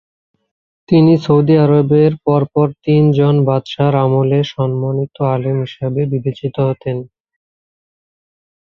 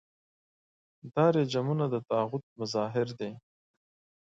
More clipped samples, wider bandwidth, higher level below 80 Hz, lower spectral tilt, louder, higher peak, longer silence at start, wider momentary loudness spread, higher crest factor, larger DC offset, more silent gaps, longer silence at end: neither; second, 6.4 kHz vs 7.8 kHz; first, -52 dBFS vs -74 dBFS; first, -9.5 dB/octave vs -7 dB/octave; first, -14 LUFS vs -30 LUFS; first, -2 dBFS vs -12 dBFS; second, 0.9 s vs 1.05 s; about the same, 9 LU vs 11 LU; second, 14 dB vs 20 dB; neither; second, none vs 2.43-2.56 s; first, 1.6 s vs 0.85 s